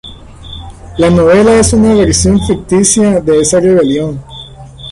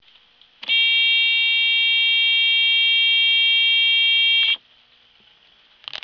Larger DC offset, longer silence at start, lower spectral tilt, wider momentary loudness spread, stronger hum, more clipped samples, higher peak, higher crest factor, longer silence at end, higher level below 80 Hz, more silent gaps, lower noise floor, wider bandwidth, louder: neither; second, 0.05 s vs 0.65 s; first, -5 dB/octave vs 2 dB/octave; first, 21 LU vs 5 LU; neither; neither; first, 0 dBFS vs -10 dBFS; about the same, 10 dB vs 10 dB; about the same, 0 s vs 0.05 s; first, -26 dBFS vs -74 dBFS; neither; second, -29 dBFS vs -55 dBFS; first, 11.5 kHz vs 5.4 kHz; first, -8 LUFS vs -15 LUFS